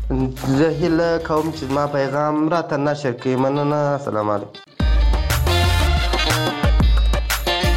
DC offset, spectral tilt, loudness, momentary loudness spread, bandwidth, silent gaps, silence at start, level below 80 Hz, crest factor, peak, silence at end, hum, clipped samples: under 0.1%; -5.5 dB/octave; -19 LUFS; 5 LU; 17 kHz; none; 0 s; -22 dBFS; 14 dB; -4 dBFS; 0 s; none; under 0.1%